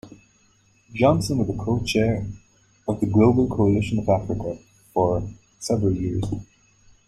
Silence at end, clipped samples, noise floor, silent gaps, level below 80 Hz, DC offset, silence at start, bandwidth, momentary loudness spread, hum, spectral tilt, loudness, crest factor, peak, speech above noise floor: 0.65 s; under 0.1%; -60 dBFS; none; -44 dBFS; under 0.1%; 0.05 s; 13 kHz; 16 LU; none; -7 dB/octave; -22 LUFS; 18 dB; -6 dBFS; 39 dB